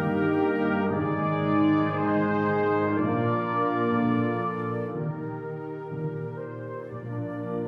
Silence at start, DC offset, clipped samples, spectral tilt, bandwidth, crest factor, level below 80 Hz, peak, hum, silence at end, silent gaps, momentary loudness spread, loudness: 0 s; under 0.1%; under 0.1%; -9.5 dB/octave; 5 kHz; 14 dB; -66 dBFS; -12 dBFS; none; 0 s; none; 11 LU; -27 LUFS